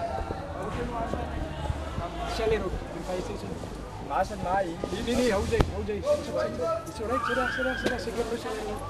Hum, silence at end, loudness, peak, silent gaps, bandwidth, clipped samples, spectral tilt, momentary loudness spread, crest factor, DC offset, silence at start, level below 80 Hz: none; 0 s; -30 LUFS; -4 dBFS; none; 15 kHz; under 0.1%; -5.5 dB/octave; 8 LU; 26 dB; under 0.1%; 0 s; -40 dBFS